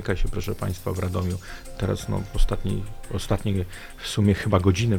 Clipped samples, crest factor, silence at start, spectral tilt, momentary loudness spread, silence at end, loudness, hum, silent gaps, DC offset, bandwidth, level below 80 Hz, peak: under 0.1%; 18 dB; 0 s; -6 dB/octave; 12 LU; 0 s; -26 LUFS; none; none; under 0.1%; 16.5 kHz; -30 dBFS; -6 dBFS